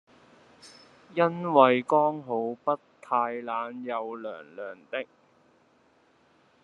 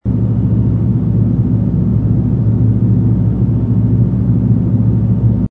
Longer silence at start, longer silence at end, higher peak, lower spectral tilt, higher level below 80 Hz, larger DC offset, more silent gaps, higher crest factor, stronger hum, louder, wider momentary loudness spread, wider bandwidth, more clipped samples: first, 0.65 s vs 0.05 s; first, 1.6 s vs 0.05 s; second, -4 dBFS vs 0 dBFS; second, -7 dB/octave vs -13 dB/octave; second, -82 dBFS vs -24 dBFS; neither; neither; first, 24 dB vs 12 dB; neither; second, -27 LUFS vs -13 LUFS; first, 19 LU vs 1 LU; first, 10.5 kHz vs 2 kHz; neither